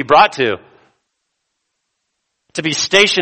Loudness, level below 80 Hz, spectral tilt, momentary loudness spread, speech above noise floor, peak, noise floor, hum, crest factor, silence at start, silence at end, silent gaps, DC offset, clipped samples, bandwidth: -14 LUFS; -56 dBFS; -2.5 dB/octave; 15 LU; 59 dB; 0 dBFS; -73 dBFS; none; 18 dB; 0 s; 0 s; none; under 0.1%; under 0.1%; 12 kHz